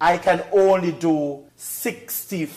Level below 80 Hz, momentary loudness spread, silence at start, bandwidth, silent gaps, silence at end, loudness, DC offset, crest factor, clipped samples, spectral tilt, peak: -58 dBFS; 12 LU; 0 s; 15.5 kHz; none; 0 s; -21 LUFS; under 0.1%; 14 dB; under 0.1%; -5 dB/octave; -8 dBFS